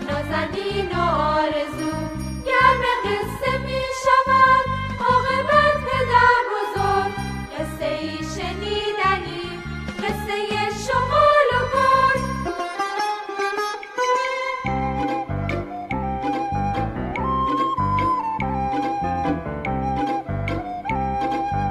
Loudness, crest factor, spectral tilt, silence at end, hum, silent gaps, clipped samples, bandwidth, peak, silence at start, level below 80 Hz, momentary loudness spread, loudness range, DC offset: -21 LUFS; 18 dB; -5.5 dB/octave; 0 s; none; none; under 0.1%; 15 kHz; -4 dBFS; 0 s; -38 dBFS; 11 LU; 6 LU; under 0.1%